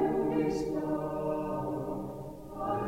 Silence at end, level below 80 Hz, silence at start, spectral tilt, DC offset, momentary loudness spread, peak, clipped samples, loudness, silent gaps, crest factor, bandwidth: 0 s; -54 dBFS; 0 s; -8 dB/octave; under 0.1%; 11 LU; -18 dBFS; under 0.1%; -33 LUFS; none; 14 dB; 16 kHz